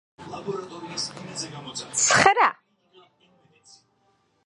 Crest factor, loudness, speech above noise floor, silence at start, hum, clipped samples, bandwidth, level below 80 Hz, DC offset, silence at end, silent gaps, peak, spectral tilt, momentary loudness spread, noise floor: 24 dB; -23 LUFS; 43 dB; 0.2 s; none; under 0.1%; 11.5 kHz; -62 dBFS; under 0.1%; 1.95 s; none; -2 dBFS; -1.5 dB/octave; 18 LU; -67 dBFS